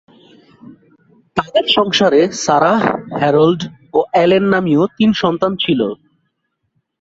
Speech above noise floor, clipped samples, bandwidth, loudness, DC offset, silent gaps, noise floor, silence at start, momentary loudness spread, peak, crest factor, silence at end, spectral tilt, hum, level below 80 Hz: 56 dB; under 0.1%; 8 kHz; -14 LUFS; under 0.1%; none; -69 dBFS; 0.7 s; 7 LU; 0 dBFS; 14 dB; 1.05 s; -5 dB/octave; none; -54 dBFS